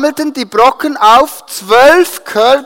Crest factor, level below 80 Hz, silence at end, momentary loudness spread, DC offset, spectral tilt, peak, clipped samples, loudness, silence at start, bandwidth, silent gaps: 10 dB; -46 dBFS; 0 s; 10 LU; under 0.1%; -2.5 dB/octave; 0 dBFS; 0.7%; -9 LUFS; 0 s; 17 kHz; none